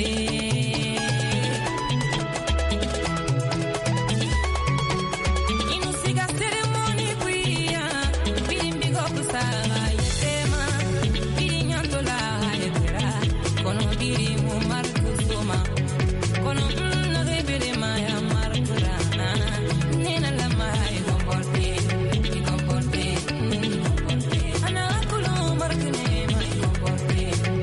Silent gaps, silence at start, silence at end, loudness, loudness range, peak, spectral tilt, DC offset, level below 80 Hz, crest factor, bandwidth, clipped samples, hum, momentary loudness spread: none; 0 s; 0 s; -24 LUFS; 0 LU; -10 dBFS; -5 dB/octave; under 0.1%; -32 dBFS; 14 dB; 11.5 kHz; under 0.1%; none; 1 LU